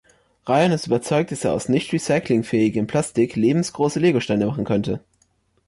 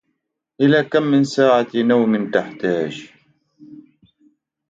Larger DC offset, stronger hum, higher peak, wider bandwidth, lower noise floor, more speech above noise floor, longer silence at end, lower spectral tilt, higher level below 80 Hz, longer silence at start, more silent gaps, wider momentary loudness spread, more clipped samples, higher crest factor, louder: neither; neither; second, -8 dBFS vs -2 dBFS; first, 11.5 kHz vs 7.8 kHz; second, -64 dBFS vs -74 dBFS; second, 44 dB vs 58 dB; second, 0.7 s vs 0.9 s; about the same, -6 dB/octave vs -6.5 dB/octave; first, -54 dBFS vs -64 dBFS; second, 0.45 s vs 0.6 s; neither; second, 5 LU vs 8 LU; neither; about the same, 14 dB vs 18 dB; second, -21 LUFS vs -17 LUFS